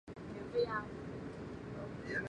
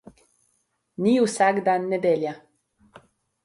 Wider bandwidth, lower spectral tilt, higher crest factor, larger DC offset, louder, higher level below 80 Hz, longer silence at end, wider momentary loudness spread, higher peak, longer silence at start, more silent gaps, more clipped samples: second, 10 kHz vs 11.5 kHz; about the same, -6.5 dB/octave vs -5.5 dB/octave; about the same, 18 dB vs 18 dB; neither; second, -42 LUFS vs -22 LUFS; first, -60 dBFS vs -70 dBFS; second, 0 s vs 1.05 s; second, 10 LU vs 15 LU; second, -24 dBFS vs -8 dBFS; second, 0.05 s vs 1 s; neither; neither